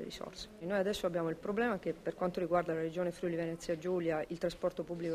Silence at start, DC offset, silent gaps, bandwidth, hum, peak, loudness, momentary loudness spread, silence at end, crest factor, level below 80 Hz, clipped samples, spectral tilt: 0 s; under 0.1%; none; 15.5 kHz; none; -18 dBFS; -36 LUFS; 6 LU; 0 s; 18 dB; -62 dBFS; under 0.1%; -6 dB/octave